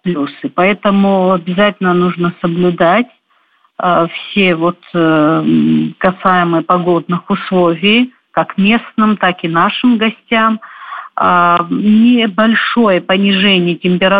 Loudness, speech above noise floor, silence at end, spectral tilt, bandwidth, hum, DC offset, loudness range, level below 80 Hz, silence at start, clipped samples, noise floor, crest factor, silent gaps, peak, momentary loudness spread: -12 LUFS; 43 dB; 0 s; -9 dB/octave; 4.9 kHz; none; under 0.1%; 2 LU; -52 dBFS; 0.05 s; under 0.1%; -55 dBFS; 12 dB; none; 0 dBFS; 7 LU